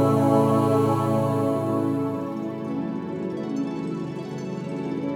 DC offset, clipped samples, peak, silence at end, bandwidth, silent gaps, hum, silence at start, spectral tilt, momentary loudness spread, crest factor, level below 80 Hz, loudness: under 0.1%; under 0.1%; -8 dBFS; 0 s; 17 kHz; none; none; 0 s; -8.5 dB/octave; 11 LU; 16 dB; -60 dBFS; -25 LUFS